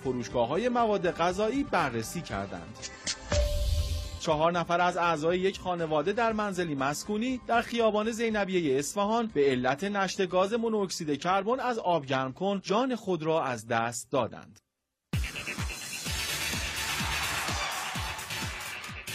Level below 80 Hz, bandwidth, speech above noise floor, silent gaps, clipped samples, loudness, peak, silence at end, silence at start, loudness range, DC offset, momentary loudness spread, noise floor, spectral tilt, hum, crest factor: -44 dBFS; 15.5 kHz; 52 dB; none; under 0.1%; -29 LUFS; -12 dBFS; 0 s; 0 s; 4 LU; under 0.1%; 8 LU; -80 dBFS; -4.5 dB/octave; none; 16 dB